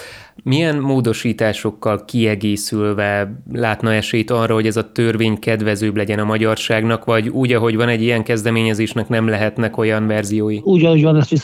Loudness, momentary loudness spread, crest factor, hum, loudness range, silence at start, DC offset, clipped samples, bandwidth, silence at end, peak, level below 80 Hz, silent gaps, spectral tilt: -17 LUFS; 5 LU; 16 dB; none; 2 LU; 0 s; under 0.1%; under 0.1%; 16 kHz; 0 s; -2 dBFS; -54 dBFS; none; -6 dB/octave